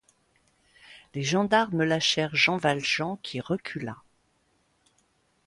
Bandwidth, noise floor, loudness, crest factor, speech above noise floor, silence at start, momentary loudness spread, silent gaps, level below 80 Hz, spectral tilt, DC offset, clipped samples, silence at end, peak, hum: 11.5 kHz; -69 dBFS; -26 LUFS; 22 dB; 43 dB; 0.9 s; 14 LU; none; -66 dBFS; -4 dB/octave; under 0.1%; under 0.1%; 1.5 s; -8 dBFS; none